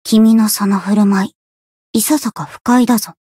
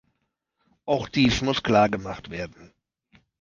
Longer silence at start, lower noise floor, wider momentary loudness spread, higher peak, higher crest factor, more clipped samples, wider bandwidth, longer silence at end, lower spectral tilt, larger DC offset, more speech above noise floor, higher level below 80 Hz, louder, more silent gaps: second, 0.05 s vs 0.85 s; first, under -90 dBFS vs -77 dBFS; second, 11 LU vs 15 LU; first, -2 dBFS vs -6 dBFS; second, 12 dB vs 22 dB; neither; first, 16 kHz vs 7.6 kHz; second, 0.3 s vs 0.75 s; about the same, -5 dB/octave vs -5.5 dB/octave; neither; first, over 78 dB vs 53 dB; second, -58 dBFS vs -46 dBFS; first, -14 LUFS vs -23 LUFS; first, 1.35-1.94 s, 2.61-2.65 s vs none